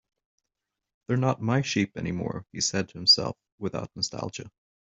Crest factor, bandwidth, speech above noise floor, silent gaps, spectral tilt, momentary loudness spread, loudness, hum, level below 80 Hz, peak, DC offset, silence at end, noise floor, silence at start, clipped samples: 22 dB; 8.2 kHz; 58 dB; 3.52-3.58 s; -4 dB/octave; 16 LU; -26 LUFS; none; -62 dBFS; -8 dBFS; under 0.1%; 0.35 s; -86 dBFS; 1.1 s; under 0.1%